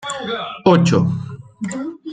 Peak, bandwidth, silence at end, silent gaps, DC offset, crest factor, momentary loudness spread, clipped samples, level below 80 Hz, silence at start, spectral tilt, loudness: -2 dBFS; 9.4 kHz; 0 s; none; under 0.1%; 16 dB; 15 LU; under 0.1%; -54 dBFS; 0 s; -6.5 dB/octave; -18 LUFS